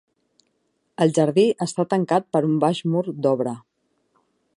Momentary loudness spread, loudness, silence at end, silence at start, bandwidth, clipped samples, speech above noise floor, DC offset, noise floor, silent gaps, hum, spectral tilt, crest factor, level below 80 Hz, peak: 7 LU; -21 LUFS; 1 s; 1 s; 11.5 kHz; under 0.1%; 50 dB; under 0.1%; -71 dBFS; none; none; -6.5 dB/octave; 18 dB; -72 dBFS; -4 dBFS